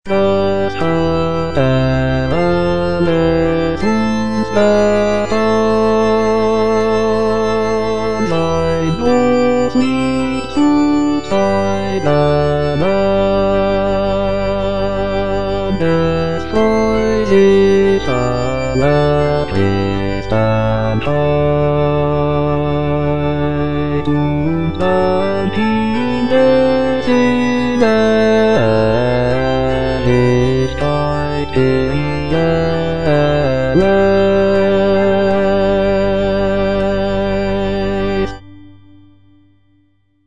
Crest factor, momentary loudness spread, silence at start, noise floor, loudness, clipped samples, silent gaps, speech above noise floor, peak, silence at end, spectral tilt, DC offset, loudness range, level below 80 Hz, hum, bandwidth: 14 dB; 5 LU; 0 s; -57 dBFS; -14 LUFS; under 0.1%; none; 45 dB; 0 dBFS; 0 s; -7 dB/octave; 5%; 3 LU; -32 dBFS; none; 10 kHz